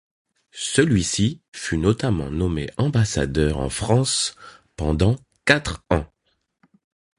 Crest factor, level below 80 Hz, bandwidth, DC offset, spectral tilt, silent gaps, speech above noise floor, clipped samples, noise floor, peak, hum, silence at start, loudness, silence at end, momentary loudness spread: 22 dB; -36 dBFS; 11.5 kHz; under 0.1%; -5 dB/octave; 1.48-1.52 s; 50 dB; under 0.1%; -71 dBFS; 0 dBFS; none; 0.55 s; -22 LUFS; 1.15 s; 8 LU